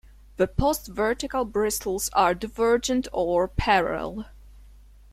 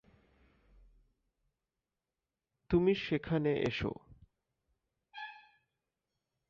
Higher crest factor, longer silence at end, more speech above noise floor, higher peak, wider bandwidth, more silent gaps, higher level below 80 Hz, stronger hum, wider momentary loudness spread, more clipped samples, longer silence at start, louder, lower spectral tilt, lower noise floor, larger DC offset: about the same, 18 dB vs 20 dB; second, 0.5 s vs 1.15 s; second, 25 dB vs over 58 dB; first, -8 dBFS vs -18 dBFS; first, 16.5 kHz vs 7 kHz; neither; first, -40 dBFS vs -60 dBFS; first, 50 Hz at -45 dBFS vs none; second, 9 LU vs 19 LU; neither; second, 0.4 s vs 2.7 s; first, -25 LUFS vs -33 LUFS; second, -4 dB/octave vs -5.5 dB/octave; second, -49 dBFS vs under -90 dBFS; neither